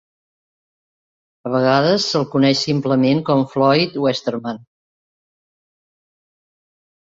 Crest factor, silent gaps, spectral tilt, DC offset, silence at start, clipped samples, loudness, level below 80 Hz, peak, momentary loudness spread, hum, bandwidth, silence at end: 18 dB; none; -5.5 dB/octave; under 0.1%; 1.45 s; under 0.1%; -17 LUFS; -62 dBFS; -2 dBFS; 11 LU; none; 7.8 kHz; 2.45 s